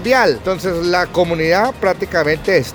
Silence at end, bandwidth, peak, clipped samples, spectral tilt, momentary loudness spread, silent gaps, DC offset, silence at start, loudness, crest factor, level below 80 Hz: 0 s; over 20 kHz; 0 dBFS; under 0.1%; -5 dB/octave; 5 LU; none; under 0.1%; 0 s; -16 LUFS; 16 dB; -40 dBFS